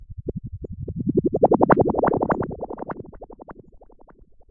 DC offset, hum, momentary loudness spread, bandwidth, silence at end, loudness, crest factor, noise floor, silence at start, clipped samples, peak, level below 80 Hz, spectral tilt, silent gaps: under 0.1%; none; 23 LU; 3.6 kHz; 0.9 s; -22 LUFS; 22 dB; -50 dBFS; 0 s; under 0.1%; -2 dBFS; -44 dBFS; -12.5 dB/octave; none